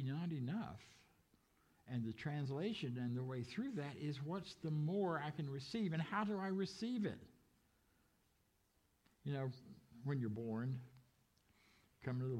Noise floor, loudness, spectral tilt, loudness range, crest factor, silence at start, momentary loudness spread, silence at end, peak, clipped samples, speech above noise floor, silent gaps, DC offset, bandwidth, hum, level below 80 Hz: -79 dBFS; -44 LUFS; -7.5 dB/octave; 6 LU; 16 dB; 0 s; 10 LU; 0 s; -28 dBFS; under 0.1%; 36 dB; none; under 0.1%; 11.5 kHz; none; -78 dBFS